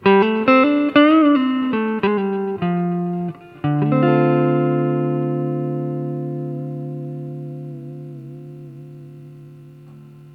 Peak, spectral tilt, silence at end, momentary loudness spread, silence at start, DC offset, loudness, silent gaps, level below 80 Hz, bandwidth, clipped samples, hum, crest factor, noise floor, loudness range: 0 dBFS; -9.5 dB/octave; 0 s; 22 LU; 0 s; under 0.1%; -18 LUFS; none; -62 dBFS; 5.8 kHz; under 0.1%; 50 Hz at -55 dBFS; 20 dB; -41 dBFS; 15 LU